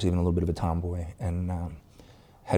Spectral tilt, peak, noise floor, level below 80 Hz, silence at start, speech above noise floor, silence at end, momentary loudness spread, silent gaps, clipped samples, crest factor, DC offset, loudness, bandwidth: -8 dB/octave; -10 dBFS; -53 dBFS; -40 dBFS; 0 s; 25 dB; 0 s; 15 LU; none; under 0.1%; 20 dB; under 0.1%; -30 LUFS; 10.5 kHz